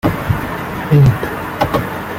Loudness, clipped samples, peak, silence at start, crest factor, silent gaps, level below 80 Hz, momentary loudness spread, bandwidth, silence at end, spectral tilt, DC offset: -16 LUFS; under 0.1%; -2 dBFS; 0.05 s; 14 dB; none; -34 dBFS; 11 LU; 16.5 kHz; 0 s; -7.5 dB/octave; under 0.1%